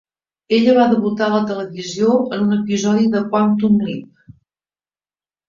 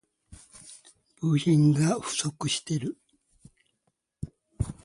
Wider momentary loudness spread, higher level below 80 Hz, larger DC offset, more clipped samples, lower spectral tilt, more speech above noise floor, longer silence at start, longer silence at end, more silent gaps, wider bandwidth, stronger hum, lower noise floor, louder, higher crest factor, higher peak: second, 10 LU vs 25 LU; second, -56 dBFS vs -50 dBFS; neither; neither; about the same, -6 dB/octave vs -5.5 dB/octave; first, over 74 dB vs 52 dB; first, 0.5 s vs 0.3 s; first, 1.45 s vs 0.1 s; neither; second, 7.4 kHz vs 11.5 kHz; neither; first, under -90 dBFS vs -77 dBFS; first, -16 LUFS vs -26 LUFS; about the same, 14 dB vs 18 dB; first, -2 dBFS vs -12 dBFS